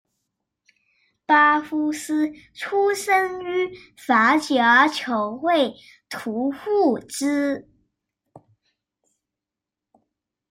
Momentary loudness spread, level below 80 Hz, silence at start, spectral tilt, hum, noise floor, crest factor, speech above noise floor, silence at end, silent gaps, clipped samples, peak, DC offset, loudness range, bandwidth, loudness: 14 LU; -68 dBFS; 1.3 s; -3 dB/octave; none; -87 dBFS; 18 dB; 66 dB; 2.1 s; none; under 0.1%; -4 dBFS; under 0.1%; 8 LU; 16 kHz; -21 LUFS